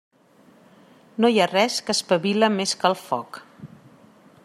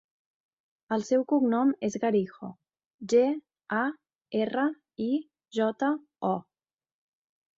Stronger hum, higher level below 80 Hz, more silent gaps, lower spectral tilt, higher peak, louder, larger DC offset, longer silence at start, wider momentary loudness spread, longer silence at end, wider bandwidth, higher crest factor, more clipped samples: neither; about the same, -72 dBFS vs -74 dBFS; second, none vs 2.86-2.99 s; second, -3.5 dB/octave vs -6 dB/octave; first, -4 dBFS vs -12 dBFS; first, -21 LUFS vs -29 LUFS; neither; first, 1.2 s vs 0.9 s; first, 14 LU vs 11 LU; second, 0.8 s vs 1.15 s; first, 15 kHz vs 7.8 kHz; about the same, 20 dB vs 16 dB; neither